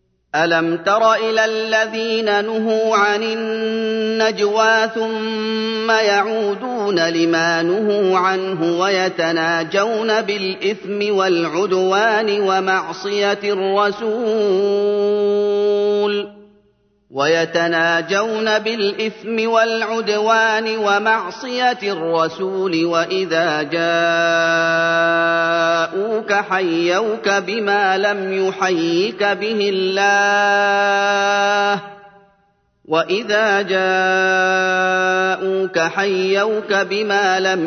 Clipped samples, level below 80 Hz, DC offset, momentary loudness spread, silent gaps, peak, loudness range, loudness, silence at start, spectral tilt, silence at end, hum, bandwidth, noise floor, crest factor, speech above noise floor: under 0.1%; -68 dBFS; under 0.1%; 5 LU; none; -2 dBFS; 2 LU; -17 LUFS; 0.35 s; -4 dB/octave; 0 s; none; 6.6 kHz; -61 dBFS; 14 dB; 44 dB